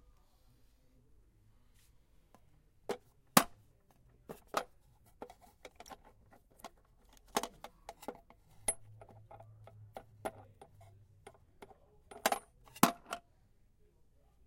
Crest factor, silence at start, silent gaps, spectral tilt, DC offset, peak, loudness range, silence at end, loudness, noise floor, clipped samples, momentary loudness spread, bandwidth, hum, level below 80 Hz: 38 dB; 2.9 s; none; -3 dB/octave; under 0.1%; -6 dBFS; 11 LU; 1.3 s; -37 LUFS; -68 dBFS; under 0.1%; 28 LU; 16.5 kHz; none; -68 dBFS